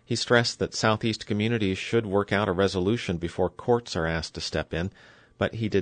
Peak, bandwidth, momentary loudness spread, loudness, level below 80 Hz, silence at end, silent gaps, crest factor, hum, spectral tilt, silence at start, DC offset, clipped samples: -8 dBFS; 9.6 kHz; 8 LU; -26 LUFS; -52 dBFS; 0 s; none; 18 dB; none; -5 dB/octave; 0.1 s; under 0.1%; under 0.1%